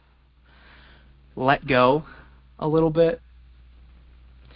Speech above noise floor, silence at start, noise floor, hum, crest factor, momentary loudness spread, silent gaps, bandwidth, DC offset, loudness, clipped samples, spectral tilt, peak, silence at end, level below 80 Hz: 36 dB; 1.35 s; -57 dBFS; none; 22 dB; 13 LU; none; 5.4 kHz; under 0.1%; -21 LUFS; under 0.1%; -11 dB/octave; -4 dBFS; 1.4 s; -50 dBFS